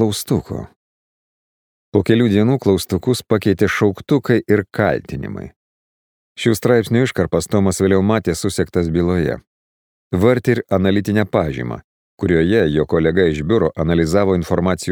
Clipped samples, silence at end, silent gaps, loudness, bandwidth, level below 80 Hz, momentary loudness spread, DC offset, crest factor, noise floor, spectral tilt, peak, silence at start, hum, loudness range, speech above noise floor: under 0.1%; 0 s; 0.76-1.92 s, 5.56-6.36 s, 9.47-10.10 s, 11.84-12.18 s; -17 LUFS; 19.5 kHz; -40 dBFS; 9 LU; under 0.1%; 16 dB; under -90 dBFS; -6.5 dB/octave; 0 dBFS; 0 s; none; 2 LU; over 74 dB